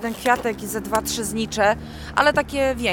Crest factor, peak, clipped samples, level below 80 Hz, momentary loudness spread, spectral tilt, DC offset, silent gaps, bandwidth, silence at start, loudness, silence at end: 20 dB; -2 dBFS; under 0.1%; -42 dBFS; 7 LU; -3.5 dB/octave; under 0.1%; none; 19 kHz; 0 s; -22 LUFS; 0 s